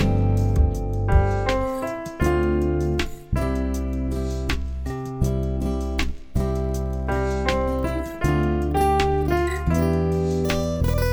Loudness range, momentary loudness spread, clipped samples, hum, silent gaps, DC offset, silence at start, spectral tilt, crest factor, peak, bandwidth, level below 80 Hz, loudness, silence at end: 4 LU; 7 LU; under 0.1%; none; none; under 0.1%; 0 s; -7 dB/octave; 18 dB; -4 dBFS; over 20 kHz; -26 dBFS; -23 LUFS; 0 s